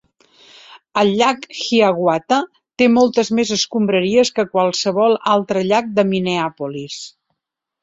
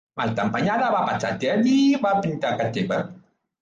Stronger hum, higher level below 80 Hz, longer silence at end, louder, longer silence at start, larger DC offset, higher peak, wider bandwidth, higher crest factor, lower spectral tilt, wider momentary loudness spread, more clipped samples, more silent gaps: neither; about the same, -60 dBFS vs -60 dBFS; first, 0.75 s vs 0.45 s; first, -17 LUFS vs -22 LUFS; first, 0.7 s vs 0.15 s; neither; first, -2 dBFS vs -10 dBFS; about the same, 8 kHz vs 7.6 kHz; about the same, 16 dB vs 12 dB; second, -4.5 dB/octave vs -6 dB/octave; first, 11 LU vs 8 LU; neither; neither